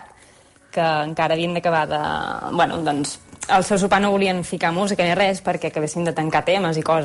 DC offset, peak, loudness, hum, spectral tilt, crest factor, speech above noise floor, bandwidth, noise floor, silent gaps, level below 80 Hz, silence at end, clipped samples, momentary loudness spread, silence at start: under 0.1%; -6 dBFS; -20 LUFS; none; -4.5 dB/octave; 16 dB; 31 dB; 11.5 kHz; -51 dBFS; none; -52 dBFS; 0 s; under 0.1%; 7 LU; 0 s